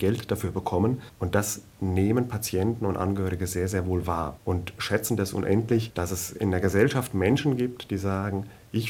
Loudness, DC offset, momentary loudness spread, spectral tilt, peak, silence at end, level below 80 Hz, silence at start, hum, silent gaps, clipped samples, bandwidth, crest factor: -27 LUFS; under 0.1%; 7 LU; -6 dB/octave; -6 dBFS; 0 s; -52 dBFS; 0 s; none; none; under 0.1%; 19 kHz; 20 dB